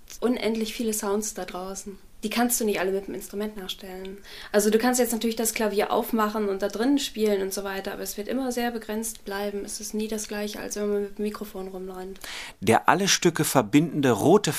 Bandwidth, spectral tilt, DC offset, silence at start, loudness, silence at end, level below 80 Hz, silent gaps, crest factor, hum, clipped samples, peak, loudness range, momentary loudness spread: 15.5 kHz; -4 dB/octave; under 0.1%; 0 s; -26 LUFS; 0 s; -52 dBFS; none; 24 dB; none; under 0.1%; -2 dBFS; 6 LU; 15 LU